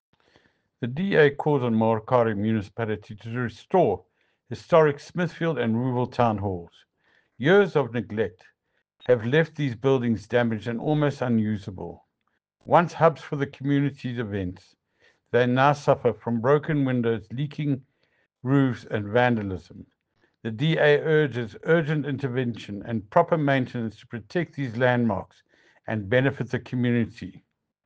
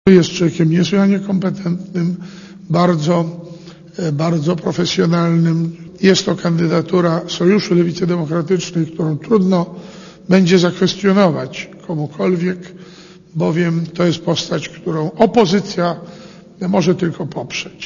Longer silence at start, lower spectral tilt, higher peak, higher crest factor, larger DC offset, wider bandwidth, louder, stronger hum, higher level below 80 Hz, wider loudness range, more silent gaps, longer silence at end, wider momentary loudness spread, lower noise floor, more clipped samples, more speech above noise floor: first, 0.8 s vs 0.05 s; first, -8 dB/octave vs -6.5 dB/octave; second, -4 dBFS vs 0 dBFS; first, 22 dB vs 16 dB; neither; about the same, 8 kHz vs 7.4 kHz; second, -24 LUFS vs -16 LUFS; neither; second, -62 dBFS vs -52 dBFS; about the same, 2 LU vs 4 LU; neither; first, 0.45 s vs 0 s; about the same, 13 LU vs 14 LU; first, -76 dBFS vs -36 dBFS; neither; first, 53 dB vs 21 dB